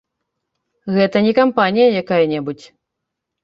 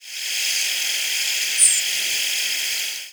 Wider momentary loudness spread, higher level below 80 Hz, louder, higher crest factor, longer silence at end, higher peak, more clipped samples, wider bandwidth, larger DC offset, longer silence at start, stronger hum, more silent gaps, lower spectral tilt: first, 15 LU vs 8 LU; first, -62 dBFS vs -80 dBFS; first, -15 LUFS vs -18 LUFS; about the same, 16 dB vs 20 dB; first, 0.9 s vs 0 s; about the same, -2 dBFS vs -2 dBFS; neither; second, 7.2 kHz vs over 20 kHz; neither; first, 0.85 s vs 0 s; neither; neither; first, -7.5 dB/octave vs 5 dB/octave